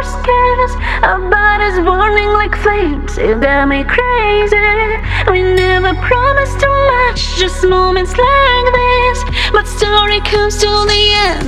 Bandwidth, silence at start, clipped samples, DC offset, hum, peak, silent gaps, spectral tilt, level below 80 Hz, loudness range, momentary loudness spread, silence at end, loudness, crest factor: 12.5 kHz; 0 s; under 0.1%; under 0.1%; none; 0 dBFS; none; -4.5 dB/octave; -20 dBFS; 1 LU; 5 LU; 0 s; -11 LUFS; 10 dB